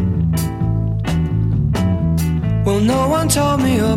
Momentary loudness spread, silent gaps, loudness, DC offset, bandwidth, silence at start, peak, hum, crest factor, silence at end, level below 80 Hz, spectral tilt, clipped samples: 4 LU; none; -17 LUFS; under 0.1%; 16 kHz; 0 s; -2 dBFS; none; 14 dB; 0 s; -28 dBFS; -6 dB/octave; under 0.1%